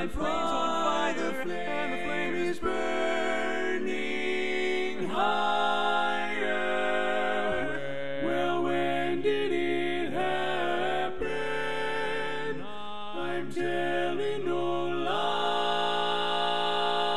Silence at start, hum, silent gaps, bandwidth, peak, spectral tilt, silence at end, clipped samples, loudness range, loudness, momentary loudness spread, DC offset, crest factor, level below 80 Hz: 0 s; none; none; 12.5 kHz; -14 dBFS; -4.5 dB/octave; 0 s; under 0.1%; 3 LU; -29 LUFS; 5 LU; 2%; 14 dB; -56 dBFS